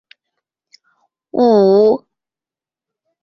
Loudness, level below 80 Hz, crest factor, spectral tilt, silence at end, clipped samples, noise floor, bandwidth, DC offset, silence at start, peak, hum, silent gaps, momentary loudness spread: -13 LUFS; -62 dBFS; 14 dB; -8.5 dB/octave; 1.25 s; under 0.1%; -90 dBFS; 6 kHz; under 0.1%; 1.35 s; -2 dBFS; none; none; 12 LU